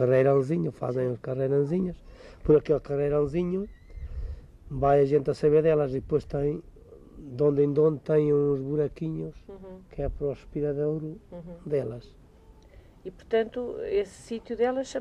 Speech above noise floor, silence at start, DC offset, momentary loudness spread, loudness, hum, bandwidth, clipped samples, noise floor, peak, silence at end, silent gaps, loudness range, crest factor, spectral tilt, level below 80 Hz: 27 dB; 0 s; under 0.1%; 20 LU; -27 LUFS; none; 9.6 kHz; under 0.1%; -53 dBFS; -10 dBFS; 0 s; none; 8 LU; 16 dB; -8.5 dB/octave; -46 dBFS